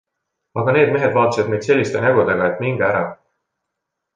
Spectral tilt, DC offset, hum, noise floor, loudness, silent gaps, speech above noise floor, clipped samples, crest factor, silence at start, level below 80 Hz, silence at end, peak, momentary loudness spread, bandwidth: -6.5 dB/octave; under 0.1%; none; -79 dBFS; -17 LUFS; none; 62 dB; under 0.1%; 16 dB; 0.55 s; -54 dBFS; 1 s; -2 dBFS; 7 LU; 9.4 kHz